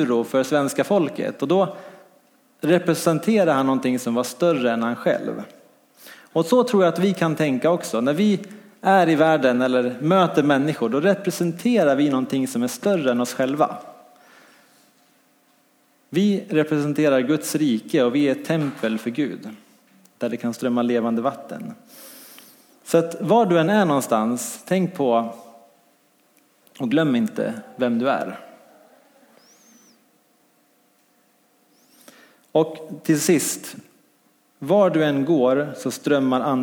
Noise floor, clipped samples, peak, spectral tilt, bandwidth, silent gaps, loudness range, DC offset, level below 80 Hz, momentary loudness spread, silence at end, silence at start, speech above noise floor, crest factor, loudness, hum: -61 dBFS; under 0.1%; -4 dBFS; -5.5 dB/octave; 19 kHz; none; 8 LU; under 0.1%; -74 dBFS; 11 LU; 0 s; 0 s; 41 dB; 18 dB; -21 LUFS; none